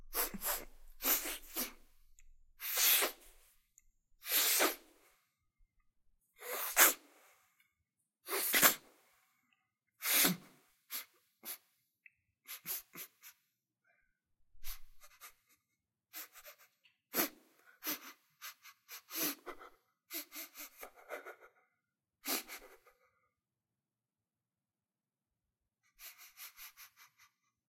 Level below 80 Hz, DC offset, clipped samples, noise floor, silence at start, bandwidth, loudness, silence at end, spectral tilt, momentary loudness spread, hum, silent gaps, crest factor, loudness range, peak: -64 dBFS; under 0.1%; under 0.1%; under -90 dBFS; 0 s; 16.5 kHz; -33 LUFS; 0.8 s; -0.5 dB/octave; 25 LU; none; none; 32 dB; 20 LU; -10 dBFS